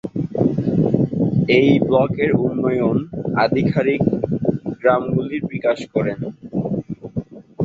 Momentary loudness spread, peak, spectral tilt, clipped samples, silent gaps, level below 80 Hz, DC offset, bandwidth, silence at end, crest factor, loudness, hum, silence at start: 11 LU; -2 dBFS; -9 dB/octave; under 0.1%; none; -48 dBFS; under 0.1%; 7.8 kHz; 0 s; 16 dB; -19 LUFS; none; 0.05 s